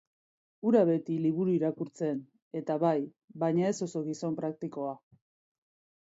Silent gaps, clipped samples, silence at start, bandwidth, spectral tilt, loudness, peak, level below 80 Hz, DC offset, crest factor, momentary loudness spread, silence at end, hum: 2.42-2.51 s, 3.24-3.28 s; under 0.1%; 0.65 s; 8 kHz; -7.5 dB/octave; -31 LUFS; -12 dBFS; -80 dBFS; under 0.1%; 18 dB; 13 LU; 1.05 s; none